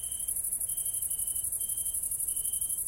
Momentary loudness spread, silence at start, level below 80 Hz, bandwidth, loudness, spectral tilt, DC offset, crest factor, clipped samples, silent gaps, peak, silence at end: 1 LU; 0 s; -56 dBFS; 16.5 kHz; -29 LUFS; 0.5 dB/octave; under 0.1%; 16 dB; under 0.1%; none; -18 dBFS; 0 s